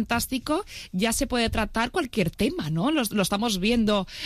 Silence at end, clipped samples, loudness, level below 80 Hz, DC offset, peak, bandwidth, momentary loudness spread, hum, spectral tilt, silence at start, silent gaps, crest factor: 0 s; under 0.1%; -25 LUFS; -40 dBFS; under 0.1%; -10 dBFS; 15.5 kHz; 4 LU; none; -4.5 dB/octave; 0 s; none; 16 dB